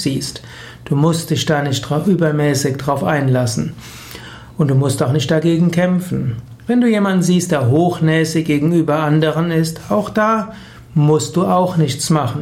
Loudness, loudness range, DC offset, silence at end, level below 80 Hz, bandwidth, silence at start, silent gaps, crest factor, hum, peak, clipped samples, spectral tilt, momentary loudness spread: -16 LUFS; 2 LU; under 0.1%; 0 s; -48 dBFS; 16 kHz; 0 s; none; 14 dB; none; -2 dBFS; under 0.1%; -6 dB/octave; 12 LU